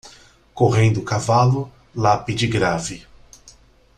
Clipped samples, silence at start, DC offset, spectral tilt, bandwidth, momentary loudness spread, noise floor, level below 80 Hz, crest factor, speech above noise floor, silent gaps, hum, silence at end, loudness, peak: under 0.1%; 0.05 s; under 0.1%; -6 dB/octave; 10.5 kHz; 11 LU; -50 dBFS; -46 dBFS; 18 dB; 32 dB; none; none; 0.45 s; -19 LUFS; -2 dBFS